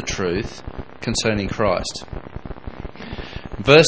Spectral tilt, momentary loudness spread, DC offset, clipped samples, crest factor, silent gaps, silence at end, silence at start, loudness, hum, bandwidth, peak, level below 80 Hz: -4.5 dB/octave; 15 LU; 0.9%; under 0.1%; 20 dB; none; 0 s; 0 s; -22 LUFS; none; 8 kHz; 0 dBFS; -38 dBFS